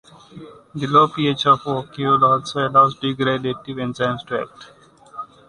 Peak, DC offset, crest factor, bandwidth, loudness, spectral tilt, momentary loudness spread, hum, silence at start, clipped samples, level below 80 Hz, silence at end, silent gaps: -2 dBFS; under 0.1%; 18 dB; 10.5 kHz; -19 LUFS; -6 dB/octave; 17 LU; none; 0.35 s; under 0.1%; -58 dBFS; 0.25 s; none